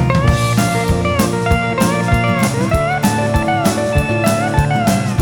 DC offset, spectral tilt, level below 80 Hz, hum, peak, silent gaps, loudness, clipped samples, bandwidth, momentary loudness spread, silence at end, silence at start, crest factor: under 0.1%; -5.5 dB/octave; -26 dBFS; none; 0 dBFS; none; -15 LUFS; under 0.1%; over 20 kHz; 2 LU; 0 s; 0 s; 14 dB